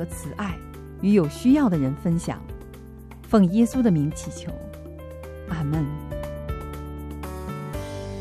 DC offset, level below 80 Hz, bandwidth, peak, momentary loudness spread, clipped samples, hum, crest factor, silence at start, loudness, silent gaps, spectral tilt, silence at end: under 0.1%; -40 dBFS; 14 kHz; -6 dBFS; 20 LU; under 0.1%; none; 18 dB; 0 s; -24 LUFS; none; -7.5 dB/octave; 0 s